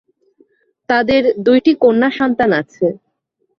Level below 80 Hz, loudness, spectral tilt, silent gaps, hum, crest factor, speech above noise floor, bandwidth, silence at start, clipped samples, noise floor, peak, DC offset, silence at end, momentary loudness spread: -50 dBFS; -14 LUFS; -7 dB/octave; none; none; 14 dB; 54 dB; 6.4 kHz; 0.9 s; under 0.1%; -67 dBFS; 0 dBFS; under 0.1%; 0.65 s; 8 LU